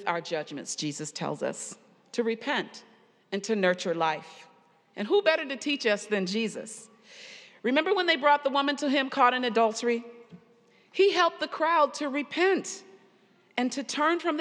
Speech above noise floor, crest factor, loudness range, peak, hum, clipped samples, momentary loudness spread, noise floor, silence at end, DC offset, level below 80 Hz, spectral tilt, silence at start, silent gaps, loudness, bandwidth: 35 dB; 20 dB; 5 LU; -8 dBFS; none; under 0.1%; 16 LU; -62 dBFS; 0 s; under 0.1%; under -90 dBFS; -3.5 dB/octave; 0 s; none; -27 LUFS; 11.5 kHz